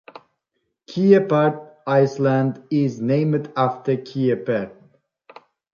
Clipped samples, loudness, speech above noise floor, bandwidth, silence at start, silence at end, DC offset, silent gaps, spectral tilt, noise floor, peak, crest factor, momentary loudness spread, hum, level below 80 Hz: under 0.1%; -20 LUFS; 56 dB; 7 kHz; 0.9 s; 1.05 s; under 0.1%; none; -8.5 dB/octave; -75 dBFS; -2 dBFS; 18 dB; 9 LU; none; -66 dBFS